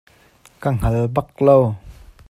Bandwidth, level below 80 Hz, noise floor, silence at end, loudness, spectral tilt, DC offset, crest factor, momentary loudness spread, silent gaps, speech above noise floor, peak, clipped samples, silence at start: 14.5 kHz; -34 dBFS; -52 dBFS; 0.4 s; -18 LUFS; -9 dB/octave; under 0.1%; 18 dB; 11 LU; none; 35 dB; 0 dBFS; under 0.1%; 0.6 s